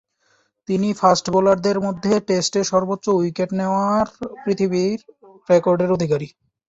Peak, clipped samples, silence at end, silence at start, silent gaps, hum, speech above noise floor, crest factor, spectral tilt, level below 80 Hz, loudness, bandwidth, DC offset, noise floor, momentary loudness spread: -2 dBFS; under 0.1%; 0.4 s; 0.7 s; none; none; 45 dB; 18 dB; -5.5 dB/octave; -56 dBFS; -19 LUFS; 8 kHz; under 0.1%; -63 dBFS; 8 LU